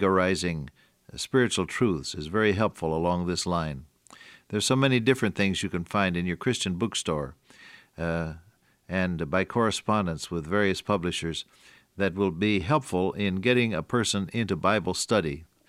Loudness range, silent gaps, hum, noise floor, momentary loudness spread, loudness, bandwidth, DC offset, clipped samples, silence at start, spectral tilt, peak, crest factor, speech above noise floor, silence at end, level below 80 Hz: 4 LU; none; none; -52 dBFS; 10 LU; -27 LUFS; 15 kHz; under 0.1%; under 0.1%; 0 s; -5 dB/octave; -8 dBFS; 20 dB; 26 dB; 0.25 s; -52 dBFS